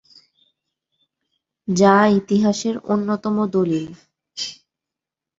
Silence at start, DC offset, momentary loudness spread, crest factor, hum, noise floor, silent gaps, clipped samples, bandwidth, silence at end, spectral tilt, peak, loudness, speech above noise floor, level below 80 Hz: 1.7 s; under 0.1%; 16 LU; 20 dB; none; -87 dBFS; none; under 0.1%; 7.8 kHz; 0.85 s; -5.5 dB/octave; -2 dBFS; -19 LUFS; 69 dB; -60 dBFS